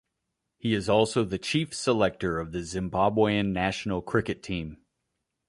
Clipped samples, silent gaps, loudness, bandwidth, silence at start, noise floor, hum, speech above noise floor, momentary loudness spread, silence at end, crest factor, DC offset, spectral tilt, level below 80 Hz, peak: under 0.1%; none; -27 LUFS; 11.5 kHz; 0.65 s; -82 dBFS; none; 55 dB; 9 LU; 0.75 s; 20 dB; under 0.1%; -5.5 dB/octave; -50 dBFS; -8 dBFS